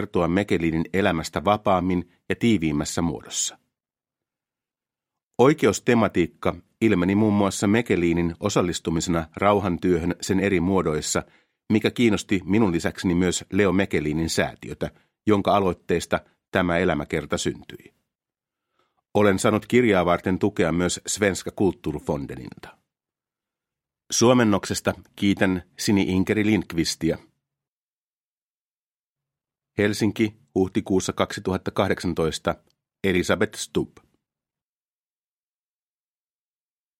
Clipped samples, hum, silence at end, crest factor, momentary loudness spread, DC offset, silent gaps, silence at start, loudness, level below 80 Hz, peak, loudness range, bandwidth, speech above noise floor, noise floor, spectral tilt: under 0.1%; none; 3.15 s; 22 dB; 9 LU; under 0.1%; 5.23-5.31 s, 16.48-16.52 s, 27.68-29.16 s; 0 s; -23 LUFS; -50 dBFS; -2 dBFS; 6 LU; 16.5 kHz; over 68 dB; under -90 dBFS; -5 dB/octave